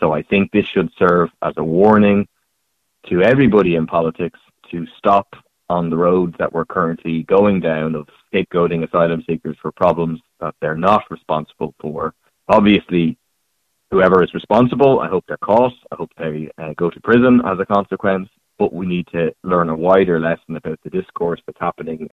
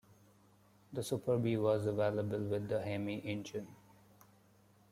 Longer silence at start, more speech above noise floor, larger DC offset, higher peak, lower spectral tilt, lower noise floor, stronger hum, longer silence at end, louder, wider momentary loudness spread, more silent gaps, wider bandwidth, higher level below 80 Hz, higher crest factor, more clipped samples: second, 0 s vs 0.9 s; first, 54 dB vs 31 dB; neither; first, 0 dBFS vs -20 dBFS; first, -9 dB/octave vs -7 dB/octave; about the same, -70 dBFS vs -67 dBFS; neither; second, 0.05 s vs 1.15 s; first, -17 LUFS vs -37 LUFS; about the same, 14 LU vs 13 LU; neither; second, 6.6 kHz vs 15.5 kHz; first, -48 dBFS vs -72 dBFS; about the same, 16 dB vs 18 dB; neither